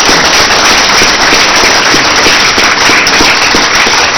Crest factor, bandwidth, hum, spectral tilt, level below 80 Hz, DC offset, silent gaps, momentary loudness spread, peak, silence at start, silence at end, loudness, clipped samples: 6 dB; over 20 kHz; none; -1 dB/octave; -28 dBFS; under 0.1%; none; 1 LU; 0 dBFS; 0 s; 0 s; -4 LUFS; 6%